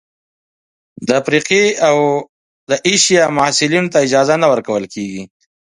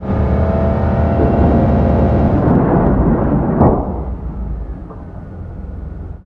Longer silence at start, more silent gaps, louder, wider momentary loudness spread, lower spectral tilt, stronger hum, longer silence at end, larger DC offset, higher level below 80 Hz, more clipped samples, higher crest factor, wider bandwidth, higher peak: first, 1 s vs 0 s; first, 2.29-2.67 s vs none; about the same, -13 LUFS vs -14 LUFS; second, 13 LU vs 17 LU; second, -3 dB/octave vs -11.5 dB/octave; neither; first, 0.4 s vs 0.05 s; neither; second, -58 dBFS vs -20 dBFS; neither; about the same, 16 dB vs 14 dB; first, 11.5 kHz vs 4.5 kHz; about the same, 0 dBFS vs 0 dBFS